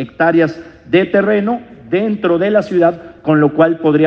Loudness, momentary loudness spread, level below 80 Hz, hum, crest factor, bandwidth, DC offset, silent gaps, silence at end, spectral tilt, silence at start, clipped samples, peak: -14 LUFS; 8 LU; -52 dBFS; none; 14 dB; 6.6 kHz; under 0.1%; none; 0 s; -8.5 dB/octave; 0 s; under 0.1%; 0 dBFS